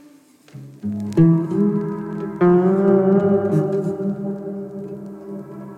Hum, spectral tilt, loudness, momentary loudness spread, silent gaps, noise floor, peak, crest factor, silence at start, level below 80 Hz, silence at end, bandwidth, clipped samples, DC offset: none; -10.5 dB/octave; -19 LUFS; 18 LU; none; -49 dBFS; -4 dBFS; 16 dB; 0.55 s; -56 dBFS; 0 s; 8.4 kHz; under 0.1%; under 0.1%